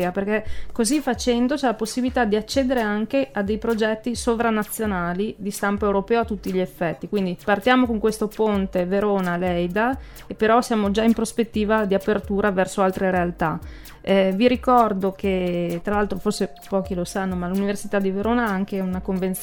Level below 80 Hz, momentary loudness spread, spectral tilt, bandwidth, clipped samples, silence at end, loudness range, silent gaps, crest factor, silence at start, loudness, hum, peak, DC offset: -42 dBFS; 7 LU; -5.5 dB/octave; 17.5 kHz; under 0.1%; 0 s; 3 LU; none; 18 dB; 0 s; -22 LUFS; none; -4 dBFS; under 0.1%